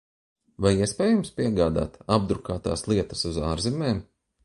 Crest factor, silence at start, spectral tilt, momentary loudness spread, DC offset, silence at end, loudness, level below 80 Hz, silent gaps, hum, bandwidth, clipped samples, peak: 20 dB; 0.6 s; -6 dB/octave; 6 LU; under 0.1%; 0.4 s; -25 LUFS; -42 dBFS; none; none; 11.5 kHz; under 0.1%; -4 dBFS